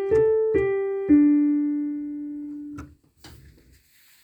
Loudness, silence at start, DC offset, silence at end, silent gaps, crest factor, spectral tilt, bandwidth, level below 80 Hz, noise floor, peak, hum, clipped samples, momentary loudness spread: -22 LUFS; 0 s; under 0.1%; 0.95 s; none; 16 dB; -8.5 dB/octave; 5 kHz; -52 dBFS; -57 dBFS; -8 dBFS; none; under 0.1%; 18 LU